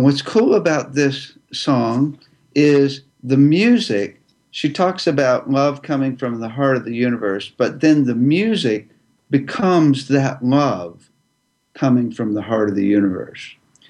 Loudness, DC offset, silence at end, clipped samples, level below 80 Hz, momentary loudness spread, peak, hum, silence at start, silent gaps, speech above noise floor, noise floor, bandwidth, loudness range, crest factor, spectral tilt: -17 LUFS; under 0.1%; 0.35 s; under 0.1%; -64 dBFS; 10 LU; -2 dBFS; none; 0 s; none; 50 dB; -67 dBFS; 10 kHz; 2 LU; 16 dB; -6.5 dB/octave